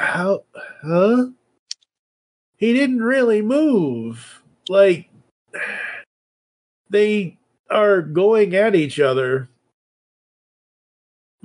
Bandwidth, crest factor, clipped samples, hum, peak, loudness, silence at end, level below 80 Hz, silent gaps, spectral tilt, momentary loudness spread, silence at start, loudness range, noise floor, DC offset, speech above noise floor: 10.5 kHz; 16 dB; under 0.1%; none; -4 dBFS; -18 LUFS; 2 s; -72 dBFS; 1.59-1.66 s, 1.99-2.53 s, 5.31-5.46 s, 6.06-6.85 s, 7.59-7.64 s; -6.5 dB/octave; 19 LU; 0 s; 4 LU; under -90 dBFS; under 0.1%; over 73 dB